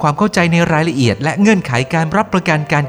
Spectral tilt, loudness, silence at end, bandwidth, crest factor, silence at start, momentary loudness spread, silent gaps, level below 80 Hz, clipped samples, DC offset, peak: -6 dB/octave; -14 LUFS; 0 s; 12.5 kHz; 14 dB; 0 s; 3 LU; none; -44 dBFS; under 0.1%; under 0.1%; 0 dBFS